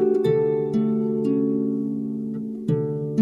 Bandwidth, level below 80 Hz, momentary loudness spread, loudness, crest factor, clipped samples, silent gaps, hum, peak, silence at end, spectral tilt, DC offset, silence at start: 7 kHz; -60 dBFS; 8 LU; -23 LUFS; 14 dB; under 0.1%; none; none; -8 dBFS; 0 s; -10 dB/octave; under 0.1%; 0 s